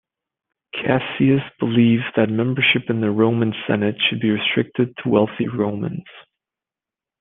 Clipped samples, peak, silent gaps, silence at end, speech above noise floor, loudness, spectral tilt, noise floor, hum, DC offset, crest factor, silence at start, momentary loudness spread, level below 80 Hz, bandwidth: under 0.1%; -2 dBFS; none; 1 s; 70 dB; -19 LUFS; -10 dB/octave; -89 dBFS; none; under 0.1%; 18 dB; 0.75 s; 6 LU; -60 dBFS; 3.9 kHz